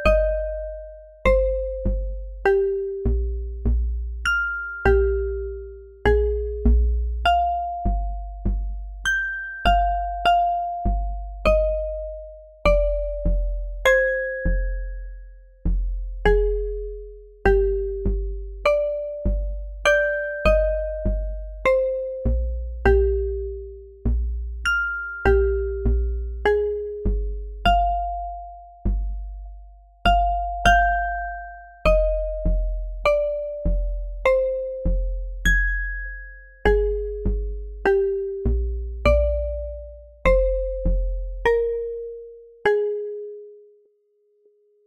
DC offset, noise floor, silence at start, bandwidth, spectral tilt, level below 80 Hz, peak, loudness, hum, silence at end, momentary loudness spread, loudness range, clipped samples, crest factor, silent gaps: under 0.1%; -64 dBFS; 0 s; 11.5 kHz; -6 dB/octave; -26 dBFS; -4 dBFS; -23 LUFS; none; 1.3 s; 14 LU; 2 LU; under 0.1%; 18 dB; none